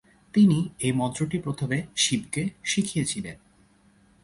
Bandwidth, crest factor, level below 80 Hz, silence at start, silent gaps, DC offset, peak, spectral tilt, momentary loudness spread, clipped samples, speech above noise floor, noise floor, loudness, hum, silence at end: 11.5 kHz; 18 dB; -58 dBFS; 0.35 s; none; under 0.1%; -10 dBFS; -4.5 dB/octave; 9 LU; under 0.1%; 35 dB; -60 dBFS; -25 LUFS; none; 0.9 s